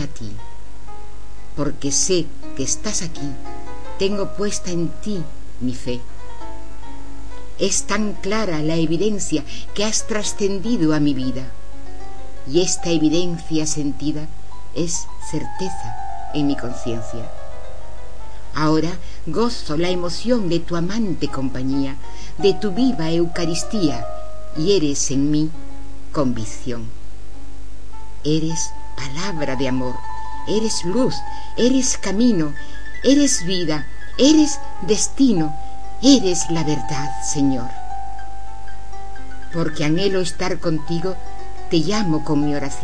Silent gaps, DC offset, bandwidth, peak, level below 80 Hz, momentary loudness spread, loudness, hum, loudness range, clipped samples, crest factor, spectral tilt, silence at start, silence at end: none; 10%; 11 kHz; 0 dBFS; -38 dBFS; 21 LU; -21 LUFS; 50 Hz at -40 dBFS; 8 LU; under 0.1%; 22 dB; -4.5 dB/octave; 0 s; 0 s